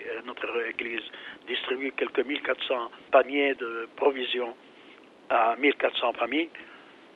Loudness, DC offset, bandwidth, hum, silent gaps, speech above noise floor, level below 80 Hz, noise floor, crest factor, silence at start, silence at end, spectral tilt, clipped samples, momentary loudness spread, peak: -28 LUFS; under 0.1%; 6.6 kHz; none; none; 24 dB; -74 dBFS; -52 dBFS; 22 dB; 0 s; 0.35 s; -4.5 dB/octave; under 0.1%; 12 LU; -6 dBFS